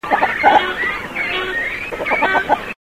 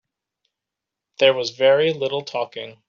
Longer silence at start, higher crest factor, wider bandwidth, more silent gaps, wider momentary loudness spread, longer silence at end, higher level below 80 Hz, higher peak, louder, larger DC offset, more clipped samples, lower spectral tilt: second, 0.05 s vs 1.2 s; about the same, 16 dB vs 20 dB; first, 16 kHz vs 7.2 kHz; neither; second, 8 LU vs 11 LU; about the same, 0.15 s vs 0.15 s; first, -44 dBFS vs -72 dBFS; about the same, -2 dBFS vs -2 dBFS; about the same, -17 LUFS vs -19 LUFS; first, 0.2% vs under 0.1%; neither; about the same, -4 dB/octave vs -4 dB/octave